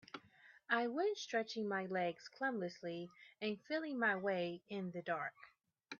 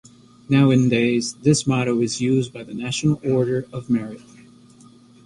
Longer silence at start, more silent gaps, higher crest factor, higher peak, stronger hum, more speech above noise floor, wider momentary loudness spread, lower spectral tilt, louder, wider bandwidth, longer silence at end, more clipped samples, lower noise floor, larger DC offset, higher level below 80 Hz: second, 0.15 s vs 0.5 s; neither; about the same, 18 dB vs 16 dB; second, -24 dBFS vs -4 dBFS; neither; second, 25 dB vs 29 dB; about the same, 10 LU vs 11 LU; second, -3 dB/octave vs -6 dB/octave; second, -41 LUFS vs -20 LUFS; second, 7.2 kHz vs 11.5 kHz; second, 0.05 s vs 1.05 s; neither; first, -66 dBFS vs -49 dBFS; neither; second, -90 dBFS vs -56 dBFS